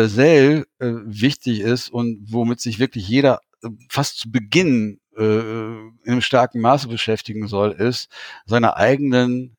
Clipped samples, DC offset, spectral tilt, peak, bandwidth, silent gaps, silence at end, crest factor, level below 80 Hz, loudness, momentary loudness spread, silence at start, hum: under 0.1%; under 0.1%; -6 dB/octave; -2 dBFS; 18.5 kHz; none; 0.1 s; 18 dB; -58 dBFS; -19 LUFS; 11 LU; 0 s; none